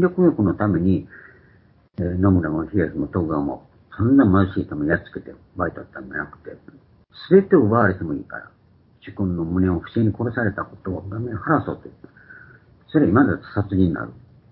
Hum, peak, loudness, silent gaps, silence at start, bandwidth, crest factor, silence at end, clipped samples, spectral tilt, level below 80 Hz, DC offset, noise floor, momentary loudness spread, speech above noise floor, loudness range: none; -2 dBFS; -21 LUFS; none; 0 s; 4.6 kHz; 20 dB; 0.35 s; under 0.1%; -13 dB/octave; -40 dBFS; under 0.1%; -54 dBFS; 20 LU; 34 dB; 4 LU